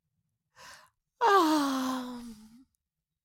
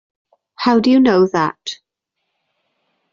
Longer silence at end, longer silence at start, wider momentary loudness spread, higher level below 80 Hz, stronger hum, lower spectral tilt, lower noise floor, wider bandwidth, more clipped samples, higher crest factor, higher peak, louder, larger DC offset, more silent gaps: second, 0.9 s vs 1.4 s; about the same, 0.6 s vs 0.6 s; first, 20 LU vs 17 LU; second, -70 dBFS vs -58 dBFS; neither; second, -2.5 dB/octave vs -6 dB/octave; first, -84 dBFS vs -76 dBFS; first, 17 kHz vs 7.4 kHz; neither; about the same, 20 dB vs 16 dB; second, -12 dBFS vs -2 dBFS; second, -27 LUFS vs -14 LUFS; neither; neither